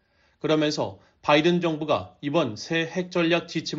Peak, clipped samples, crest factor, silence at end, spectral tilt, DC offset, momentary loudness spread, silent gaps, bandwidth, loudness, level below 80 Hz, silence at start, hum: -6 dBFS; under 0.1%; 18 dB; 0 s; -4 dB/octave; under 0.1%; 9 LU; none; 7.6 kHz; -25 LUFS; -64 dBFS; 0.45 s; none